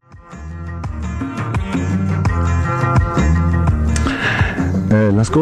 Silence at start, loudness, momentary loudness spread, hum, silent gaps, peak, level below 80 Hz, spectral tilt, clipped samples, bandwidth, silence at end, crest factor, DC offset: 0.1 s; -17 LUFS; 12 LU; none; none; -4 dBFS; -24 dBFS; -7 dB/octave; under 0.1%; 10.5 kHz; 0 s; 12 dB; under 0.1%